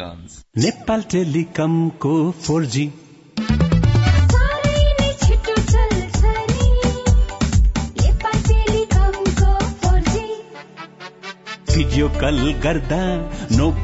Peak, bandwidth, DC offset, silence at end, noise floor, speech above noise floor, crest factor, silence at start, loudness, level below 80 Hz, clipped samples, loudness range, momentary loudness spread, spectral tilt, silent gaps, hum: -4 dBFS; 8 kHz; under 0.1%; 0 s; -37 dBFS; 18 dB; 14 dB; 0 s; -18 LUFS; -20 dBFS; under 0.1%; 4 LU; 14 LU; -6 dB/octave; none; none